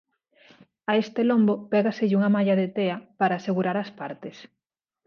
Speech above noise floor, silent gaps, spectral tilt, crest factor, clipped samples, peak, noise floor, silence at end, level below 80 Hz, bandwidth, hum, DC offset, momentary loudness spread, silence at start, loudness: 34 dB; none; -8 dB/octave; 16 dB; under 0.1%; -8 dBFS; -57 dBFS; 0.6 s; -74 dBFS; 6.6 kHz; none; under 0.1%; 14 LU; 0.9 s; -24 LUFS